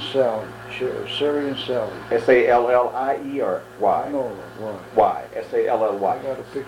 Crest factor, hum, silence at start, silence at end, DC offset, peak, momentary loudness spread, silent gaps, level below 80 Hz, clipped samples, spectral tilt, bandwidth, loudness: 18 dB; none; 0 s; 0 s; under 0.1%; -2 dBFS; 13 LU; none; -56 dBFS; under 0.1%; -5.5 dB/octave; 16 kHz; -22 LUFS